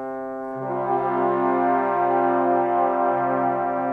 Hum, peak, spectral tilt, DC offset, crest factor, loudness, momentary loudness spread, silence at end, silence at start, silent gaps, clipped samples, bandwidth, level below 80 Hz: none; -10 dBFS; -9.5 dB/octave; under 0.1%; 12 dB; -22 LUFS; 9 LU; 0 s; 0 s; none; under 0.1%; 4.2 kHz; -64 dBFS